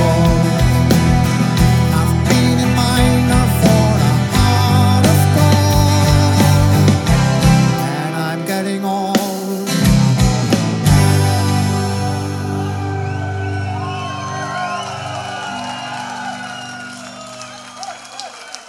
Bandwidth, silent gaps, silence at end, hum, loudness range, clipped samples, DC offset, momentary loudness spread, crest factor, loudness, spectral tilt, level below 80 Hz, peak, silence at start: 18 kHz; none; 0.05 s; none; 12 LU; under 0.1%; under 0.1%; 15 LU; 14 dB; -15 LUFS; -5.5 dB/octave; -28 dBFS; 0 dBFS; 0 s